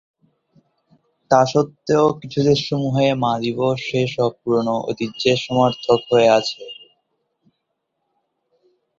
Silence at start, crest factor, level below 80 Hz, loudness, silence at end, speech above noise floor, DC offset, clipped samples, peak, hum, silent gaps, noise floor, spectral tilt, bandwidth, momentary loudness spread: 1.3 s; 18 dB; -56 dBFS; -18 LUFS; 2.25 s; 57 dB; under 0.1%; under 0.1%; -2 dBFS; none; none; -75 dBFS; -6 dB/octave; 7.6 kHz; 7 LU